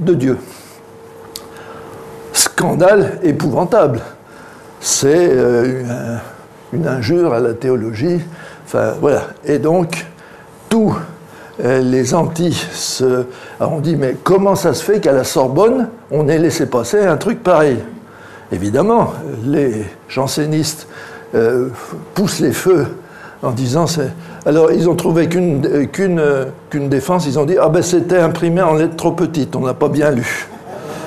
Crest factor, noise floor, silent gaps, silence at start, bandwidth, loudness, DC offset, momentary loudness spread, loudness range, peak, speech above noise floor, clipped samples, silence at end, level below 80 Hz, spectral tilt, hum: 16 dB; -38 dBFS; none; 0 s; 13.5 kHz; -15 LUFS; under 0.1%; 15 LU; 4 LU; 0 dBFS; 24 dB; under 0.1%; 0 s; -48 dBFS; -5.5 dB/octave; none